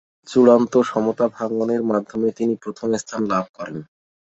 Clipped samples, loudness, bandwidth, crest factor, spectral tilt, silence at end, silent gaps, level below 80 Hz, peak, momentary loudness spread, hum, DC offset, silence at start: under 0.1%; -20 LUFS; 8 kHz; 18 dB; -6 dB/octave; 0.5 s; 3.49-3.54 s; -62 dBFS; -2 dBFS; 13 LU; none; under 0.1%; 0.25 s